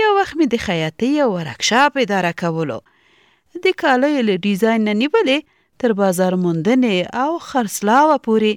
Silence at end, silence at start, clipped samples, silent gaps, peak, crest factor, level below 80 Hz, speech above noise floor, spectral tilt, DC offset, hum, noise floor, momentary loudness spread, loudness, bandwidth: 0 s; 0 s; under 0.1%; none; -4 dBFS; 14 dB; -56 dBFS; 39 dB; -5 dB/octave; under 0.1%; none; -56 dBFS; 7 LU; -17 LUFS; 17 kHz